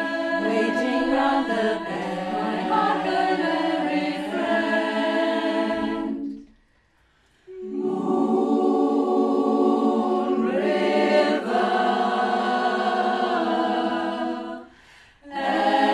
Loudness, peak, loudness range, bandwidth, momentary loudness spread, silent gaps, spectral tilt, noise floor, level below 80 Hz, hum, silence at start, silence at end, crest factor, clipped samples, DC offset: -23 LUFS; -8 dBFS; 5 LU; 11.5 kHz; 8 LU; none; -5.5 dB/octave; -62 dBFS; -60 dBFS; none; 0 s; 0 s; 16 dB; under 0.1%; under 0.1%